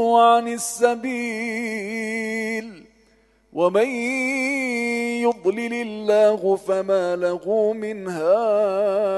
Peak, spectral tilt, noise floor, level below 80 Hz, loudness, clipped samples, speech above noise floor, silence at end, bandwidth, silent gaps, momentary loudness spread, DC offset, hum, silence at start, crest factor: -4 dBFS; -4 dB/octave; -59 dBFS; -66 dBFS; -21 LUFS; under 0.1%; 38 dB; 0 s; 12.5 kHz; none; 9 LU; under 0.1%; none; 0 s; 18 dB